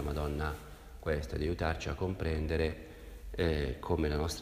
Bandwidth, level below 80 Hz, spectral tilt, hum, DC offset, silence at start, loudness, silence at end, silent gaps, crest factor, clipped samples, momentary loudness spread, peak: 15.5 kHz; -40 dBFS; -6 dB/octave; none; under 0.1%; 0 s; -35 LUFS; 0 s; none; 18 dB; under 0.1%; 13 LU; -16 dBFS